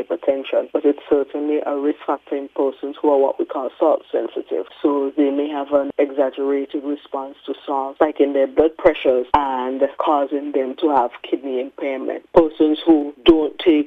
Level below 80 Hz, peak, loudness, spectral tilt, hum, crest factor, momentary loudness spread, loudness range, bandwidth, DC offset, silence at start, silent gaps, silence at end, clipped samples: -48 dBFS; 0 dBFS; -19 LUFS; -7 dB/octave; none; 18 dB; 9 LU; 3 LU; 4.6 kHz; under 0.1%; 0 s; none; 0 s; under 0.1%